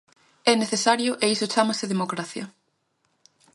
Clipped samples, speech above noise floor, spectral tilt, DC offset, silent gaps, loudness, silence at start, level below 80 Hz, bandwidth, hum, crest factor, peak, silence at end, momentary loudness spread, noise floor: under 0.1%; 48 dB; -3 dB/octave; under 0.1%; none; -23 LUFS; 0.45 s; -74 dBFS; 11.5 kHz; none; 22 dB; -4 dBFS; 1.05 s; 13 LU; -72 dBFS